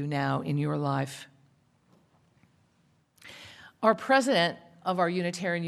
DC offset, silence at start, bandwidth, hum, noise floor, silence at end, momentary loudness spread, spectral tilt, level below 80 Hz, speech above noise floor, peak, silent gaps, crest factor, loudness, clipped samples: under 0.1%; 0 s; 13.5 kHz; none; -68 dBFS; 0 s; 23 LU; -5.5 dB/octave; -74 dBFS; 40 dB; -8 dBFS; none; 22 dB; -28 LUFS; under 0.1%